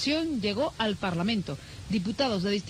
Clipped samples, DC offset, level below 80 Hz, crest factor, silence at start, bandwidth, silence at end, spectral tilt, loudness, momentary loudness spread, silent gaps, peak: under 0.1%; under 0.1%; -52 dBFS; 16 dB; 0 s; 13 kHz; 0 s; -5.5 dB/octave; -29 LUFS; 5 LU; none; -14 dBFS